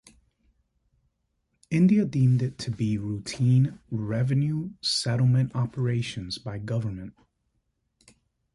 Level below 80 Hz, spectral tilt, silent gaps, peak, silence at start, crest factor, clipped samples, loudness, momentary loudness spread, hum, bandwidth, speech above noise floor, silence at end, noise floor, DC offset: -56 dBFS; -6.5 dB/octave; none; -12 dBFS; 1.7 s; 14 dB; under 0.1%; -26 LUFS; 12 LU; none; 11.5 kHz; 51 dB; 1.45 s; -75 dBFS; under 0.1%